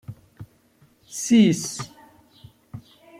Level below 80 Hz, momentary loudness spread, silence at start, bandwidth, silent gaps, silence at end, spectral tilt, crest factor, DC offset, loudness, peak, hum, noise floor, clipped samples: -62 dBFS; 26 LU; 0.1 s; 15.5 kHz; none; 0.4 s; -5 dB/octave; 20 dB; under 0.1%; -21 LUFS; -6 dBFS; none; -59 dBFS; under 0.1%